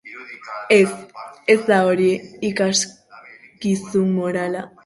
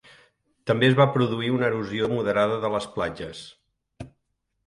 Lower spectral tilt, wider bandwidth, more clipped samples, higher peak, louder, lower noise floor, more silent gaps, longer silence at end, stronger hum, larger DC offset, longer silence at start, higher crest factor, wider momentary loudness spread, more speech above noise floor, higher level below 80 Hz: second, -4.5 dB/octave vs -6.5 dB/octave; about the same, 11.5 kHz vs 11.5 kHz; neither; first, -2 dBFS vs -6 dBFS; first, -19 LUFS vs -23 LUFS; second, -44 dBFS vs -76 dBFS; neither; second, 0.2 s vs 0.6 s; neither; neither; second, 0.05 s vs 0.65 s; about the same, 18 dB vs 20 dB; second, 17 LU vs 24 LU; second, 25 dB vs 53 dB; about the same, -62 dBFS vs -58 dBFS